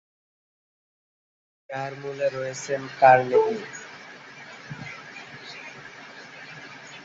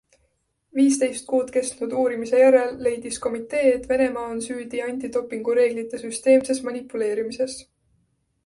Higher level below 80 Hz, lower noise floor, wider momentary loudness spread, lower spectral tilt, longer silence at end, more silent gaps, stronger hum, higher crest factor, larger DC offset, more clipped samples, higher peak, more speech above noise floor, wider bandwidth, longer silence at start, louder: second, -72 dBFS vs -58 dBFS; second, -44 dBFS vs -70 dBFS; first, 24 LU vs 11 LU; about the same, -4.5 dB/octave vs -3.5 dB/octave; second, 0 s vs 0.85 s; neither; neither; first, 24 dB vs 18 dB; neither; neither; about the same, -4 dBFS vs -4 dBFS; second, 22 dB vs 48 dB; second, 8 kHz vs 11.5 kHz; first, 1.7 s vs 0.75 s; about the same, -23 LUFS vs -22 LUFS